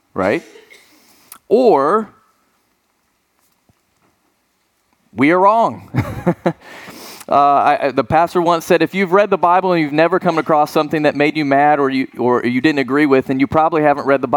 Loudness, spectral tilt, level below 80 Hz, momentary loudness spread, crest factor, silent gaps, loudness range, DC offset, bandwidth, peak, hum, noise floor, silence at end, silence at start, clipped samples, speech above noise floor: -15 LUFS; -6.5 dB/octave; -50 dBFS; 10 LU; 14 dB; none; 5 LU; under 0.1%; 19.5 kHz; 0 dBFS; none; -64 dBFS; 0 s; 0.15 s; under 0.1%; 50 dB